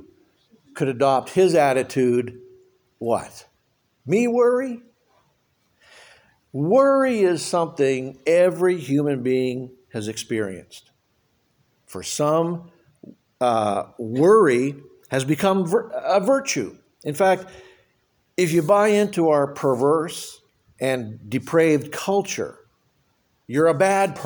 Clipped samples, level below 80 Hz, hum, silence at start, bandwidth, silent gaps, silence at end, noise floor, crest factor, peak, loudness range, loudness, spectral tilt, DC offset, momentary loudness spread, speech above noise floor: under 0.1%; -66 dBFS; none; 0.75 s; over 20 kHz; none; 0 s; -68 dBFS; 18 dB; -4 dBFS; 6 LU; -21 LUFS; -5.5 dB/octave; under 0.1%; 15 LU; 47 dB